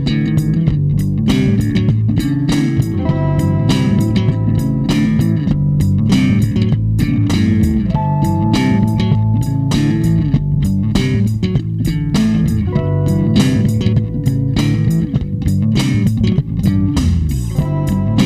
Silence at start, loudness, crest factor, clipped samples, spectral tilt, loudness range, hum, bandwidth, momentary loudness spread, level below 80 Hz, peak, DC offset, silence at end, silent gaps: 0 s; -15 LUFS; 12 dB; under 0.1%; -7.5 dB/octave; 1 LU; none; 15 kHz; 3 LU; -28 dBFS; 0 dBFS; under 0.1%; 0 s; none